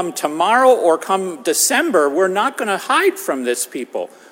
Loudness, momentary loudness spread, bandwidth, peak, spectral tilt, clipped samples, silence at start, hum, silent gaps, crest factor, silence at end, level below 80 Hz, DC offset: -16 LUFS; 9 LU; 16.5 kHz; 0 dBFS; -2 dB/octave; under 0.1%; 0 s; none; none; 16 dB; 0.25 s; -80 dBFS; under 0.1%